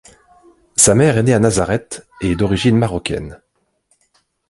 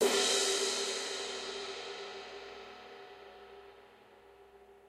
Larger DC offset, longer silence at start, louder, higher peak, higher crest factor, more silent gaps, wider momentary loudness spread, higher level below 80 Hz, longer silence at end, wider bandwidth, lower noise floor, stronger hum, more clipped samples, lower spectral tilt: neither; first, 0.8 s vs 0 s; first, -15 LUFS vs -33 LUFS; first, 0 dBFS vs -18 dBFS; about the same, 18 dB vs 20 dB; neither; second, 13 LU vs 24 LU; first, -38 dBFS vs -74 dBFS; first, 1.15 s vs 0 s; second, 12 kHz vs 16 kHz; first, -63 dBFS vs -59 dBFS; second, none vs 60 Hz at -90 dBFS; neither; first, -4.5 dB/octave vs 0 dB/octave